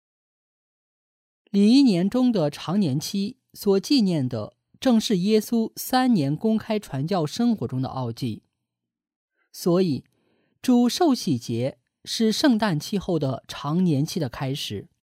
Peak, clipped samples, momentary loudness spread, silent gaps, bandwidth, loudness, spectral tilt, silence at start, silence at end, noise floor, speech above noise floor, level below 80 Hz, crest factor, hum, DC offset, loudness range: -6 dBFS; under 0.1%; 10 LU; 9.16-9.28 s; 16 kHz; -23 LUFS; -6 dB/octave; 1.55 s; 0.2 s; -83 dBFS; 61 dB; -60 dBFS; 18 dB; none; under 0.1%; 5 LU